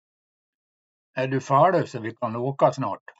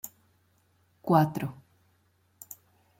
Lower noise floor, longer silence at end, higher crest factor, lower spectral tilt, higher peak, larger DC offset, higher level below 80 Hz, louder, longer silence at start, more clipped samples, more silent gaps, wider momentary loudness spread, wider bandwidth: first, under -90 dBFS vs -69 dBFS; second, 0.25 s vs 1.45 s; about the same, 20 dB vs 22 dB; about the same, -7 dB/octave vs -7 dB/octave; first, -4 dBFS vs -10 dBFS; neither; second, -78 dBFS vs -70 dBFS; first, -23 LUFS vs -28 LUFS; first, 1.15 s vs 0.05 s; neither; neither; second, 12 LU vs 24 LU; second, 8 kHz vs 16.5 kHz